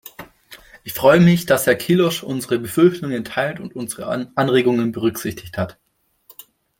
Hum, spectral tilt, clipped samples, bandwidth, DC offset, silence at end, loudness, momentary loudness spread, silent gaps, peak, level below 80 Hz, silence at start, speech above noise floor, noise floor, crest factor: none; -5.5 dB/octave; under 0.1%; 17 kHz; under 0.1%; 1.1 s; -18 LUFS; 14 LU; none; -2 dBFS; -54 dBFS; 0.05 s; 35 dB; -52 dBFS; 18 dB